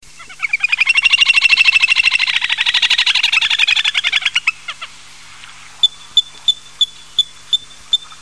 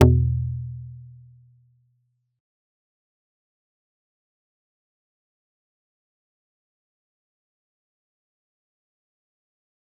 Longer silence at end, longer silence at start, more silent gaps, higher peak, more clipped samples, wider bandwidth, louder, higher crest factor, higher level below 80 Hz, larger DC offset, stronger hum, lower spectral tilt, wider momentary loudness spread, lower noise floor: second, 0.05 s vs 8.95 s; first, 0.2 s vs 0 s; neither; about the same, 0 dBFS vs -2 dBFS; neither; first, 11 kHz vs 4 kHz; first, -12 LUFS vs -24 LUFS; second, 16 dB vs 28 dB; second, -52 dBFS vs -42 dBFS; first, 0.9% vs under 0.1%; neither; second, 3 dB/octave vs -9 dB/octave; second, 10 LU vs 25 LU; second, -39 dBFS vs -71 dBFS